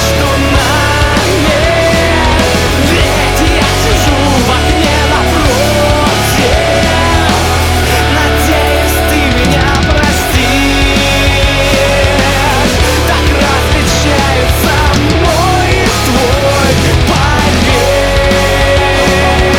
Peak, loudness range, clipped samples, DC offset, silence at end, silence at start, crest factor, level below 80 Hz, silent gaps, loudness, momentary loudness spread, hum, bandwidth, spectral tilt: 0 dBFS; 0 LU; under 0.1%; under 0.1%; 0 s; 0 s; 8 dB; -16 dBFS; none; -9 LUFS; 1 LU; none; 18.5 kHz; -4.5 dB/octave